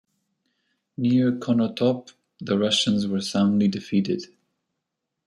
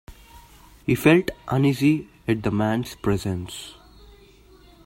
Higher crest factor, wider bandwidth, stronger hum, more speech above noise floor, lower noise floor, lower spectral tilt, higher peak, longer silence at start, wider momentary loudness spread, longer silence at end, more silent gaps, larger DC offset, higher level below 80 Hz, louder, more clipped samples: second, 16 dB vs 22 dB; second, 11.5 kHz vs 16 kHz; neither; first, 60 dB vs 29 dB; first, -82 dBFS vs -51 dBFS; about the same, -5.5 dB/octave vs -6.5 dB/octave; second, -8 dBFS vs -2 dBFS; first, 1 s vs 0.1 s; second, 9 LU vs 15 LU; second, 1 s vs 1.15 s; neither; neither; second, -66 dBFS vs -48 dBFS; about the same, -23 LUFS vs -22 LUFS; neither